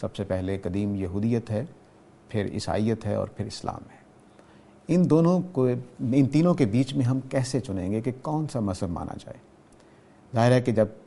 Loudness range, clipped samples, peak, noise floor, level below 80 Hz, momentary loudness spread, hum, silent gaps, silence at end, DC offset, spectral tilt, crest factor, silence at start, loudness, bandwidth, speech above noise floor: 7 LU; under 0.1%; -6 dBFS; -54 dBFS; -54 dBFS; 13 LU; none; none; 0.1 s; under 0.1%; -7.5 dB/octave; 20 dB; 0 s; -26 LUFS; 11.5 kHz; 29 dB